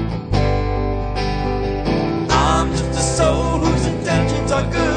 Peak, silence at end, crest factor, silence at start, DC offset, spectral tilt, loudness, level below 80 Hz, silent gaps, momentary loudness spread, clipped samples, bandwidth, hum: -2 dBFS; 0 s; 16 dB; 0 s; under 0.1%; -5.5 dB/octave; -19 LUFS; -26 dBFS; none; 5 LU; under 0.1%; 9.4 kHz; none